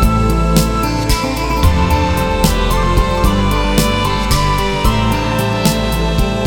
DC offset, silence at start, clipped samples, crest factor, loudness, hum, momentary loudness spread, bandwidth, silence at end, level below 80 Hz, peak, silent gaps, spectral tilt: under 0.1%; 0 s; under 0.1%; 12 dB; -14 LUFS; none; 3 LU; 19.5 kHz; 0 s; -18 dBFS; 0 dBFS; none; -5 dB/octave